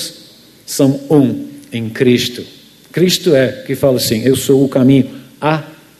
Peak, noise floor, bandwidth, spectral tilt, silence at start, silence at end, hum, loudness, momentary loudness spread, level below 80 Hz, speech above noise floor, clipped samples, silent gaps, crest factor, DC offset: 0 dBFS; -42 dBFS; 14 kHz; -5.5 dB/octave; 0 s; 0.25 s; none; -13 LUFS; 13 LU; -50 dBFS; 29 dB; under 0.1%; none; 14 dB; under 0.1%